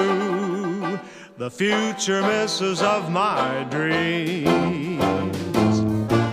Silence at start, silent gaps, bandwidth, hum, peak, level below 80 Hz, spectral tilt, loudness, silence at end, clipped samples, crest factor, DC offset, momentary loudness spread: 0 s; none; 15.5 kHz; none; -4 dBFS; -52 dBFS; -5 dB/octave; -22 LUFS; 0 s; under 0.1%; 16 dB; under 0.1%; 6 LU